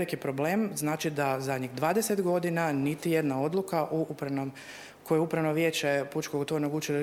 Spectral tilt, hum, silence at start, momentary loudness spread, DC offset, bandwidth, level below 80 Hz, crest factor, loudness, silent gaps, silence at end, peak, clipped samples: -5.5 dB/octave; none; 0 s; 6 LU; under 0.1%; 17 kHz; -72 dBFS; 16 dB; -29 LUFS; none; 0 s; -14 dBFS; under 0.1%